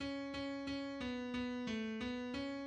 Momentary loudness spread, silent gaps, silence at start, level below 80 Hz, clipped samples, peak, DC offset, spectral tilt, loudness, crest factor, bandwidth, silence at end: 2 LU; none; 0 s; -64 dBFS; under 0.1%; -30 dBFS; under 0.1%; -5 dB/octave; -42 LUFS; 12 dB; 9.4 kHz; 0 s